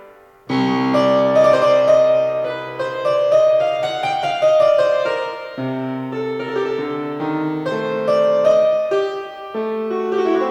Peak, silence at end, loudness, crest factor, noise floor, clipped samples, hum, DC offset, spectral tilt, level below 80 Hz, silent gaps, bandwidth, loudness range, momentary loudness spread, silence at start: -2 dBFS; 0 s; -17 LUFS; 14 dB; -41 dBFS; under 0.1%; none; under 0.1%; -6 dB/octave; -60 dBFS; none; 8.6 kHz; 5 LU; 11 LU; 0 s